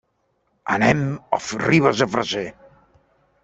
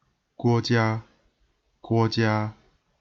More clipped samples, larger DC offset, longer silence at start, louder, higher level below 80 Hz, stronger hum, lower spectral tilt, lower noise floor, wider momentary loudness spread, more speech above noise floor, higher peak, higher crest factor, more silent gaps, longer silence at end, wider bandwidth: neither; neither; first, 0.65 s vs 0.4 s; first, -20 LUFS vs -25 LUFS; about the same, -54 dBFS vs -58 dBFS; neither; second, -5.5 dB/octave vs -7 dB/octave; about the same, -68 dBFS vs -69 dBFS; first, 11 LU vs 8 LU; about the same, 49 dB vs 46 dB; first, -2 dBFS vs -10 dBFS; about the same, 20 dB vs 18 dB; neither; first, 0.95 s vs 0.5 s; first, 8.2 kHz vs 7.4 kHz